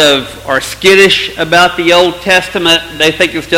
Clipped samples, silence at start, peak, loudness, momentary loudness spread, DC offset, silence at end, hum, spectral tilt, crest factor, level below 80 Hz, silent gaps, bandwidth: 1%; 0 s; 0 dBFS; -9 LUFS; 8 LU; under 0.1%; 0 s; none; -3 dB/octave; 10 dB; -38 dBFS; none; 17 kHz